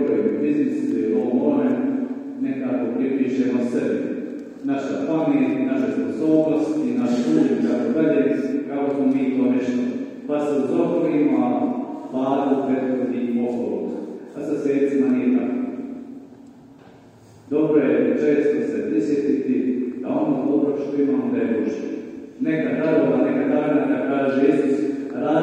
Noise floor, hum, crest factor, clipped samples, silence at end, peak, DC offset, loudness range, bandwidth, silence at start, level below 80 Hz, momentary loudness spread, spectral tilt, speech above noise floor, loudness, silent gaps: -47 dBFS; none; 16 dB; under 0.1%; 0 s; -4 dBFS; under 0.1%; 3 LU; 8.6 kHz; 0 s; -70 dBFS; 9 LU; -8 dB/octave; 27 dB; -21 LUFS; none